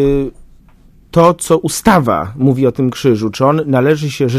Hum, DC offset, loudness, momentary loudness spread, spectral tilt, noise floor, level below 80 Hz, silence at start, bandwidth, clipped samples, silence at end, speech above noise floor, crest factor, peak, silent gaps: none; under 0.1%; -13 LUFS; 5 LU; -6 dB/octave; -44 dBFS; -36 dBFS; 0 s; 15.5 kHz; 0.2%; 0 s; 32 dB; 14 dB; 0 dBFS; none